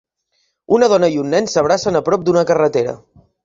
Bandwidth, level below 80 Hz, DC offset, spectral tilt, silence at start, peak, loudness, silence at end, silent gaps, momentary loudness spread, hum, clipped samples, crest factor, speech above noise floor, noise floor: 7.8 kHz; -54 dBFS; under 0.1%; -5 dB/octave; 0.7 s; -2 dBFS; -15 LUFS; 0.5 s; none; 6 LU; none; under 0.1%; 14 dB; 52 dB; -66 dBFS